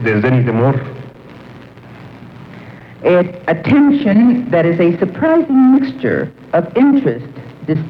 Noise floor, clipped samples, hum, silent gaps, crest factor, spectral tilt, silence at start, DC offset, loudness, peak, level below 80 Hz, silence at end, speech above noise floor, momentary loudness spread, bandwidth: -36 dBFS; under 0.1%; none; none; 12 dB; -10 dB/octave; 0 s; under 0.1%; -13 LUFS; -2 dBFS; -52 dBFS; 0 s; 24 dB; 19 LU; 5.2 kHz